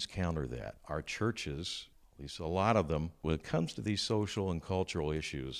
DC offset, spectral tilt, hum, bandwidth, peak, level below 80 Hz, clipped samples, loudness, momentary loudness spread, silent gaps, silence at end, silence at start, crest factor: under 0.1%; -5.5 dB/octave; none; 14.5 kHz; -14 dBFS; -48 dBFS; under 0.1%; -35 LUFS; 11 LU; none; 0 s; 0 s; 20 dB